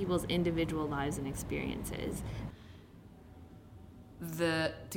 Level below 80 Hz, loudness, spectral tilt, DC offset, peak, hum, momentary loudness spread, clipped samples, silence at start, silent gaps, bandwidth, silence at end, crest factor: -50 dBFS; -36 LUFS; -5.5 dB/octave; under 0.1%; -20 dBFS; none; 23 LU; under 0.1%; 0 s; none; 16.5 kHz; 0 s; 18 dB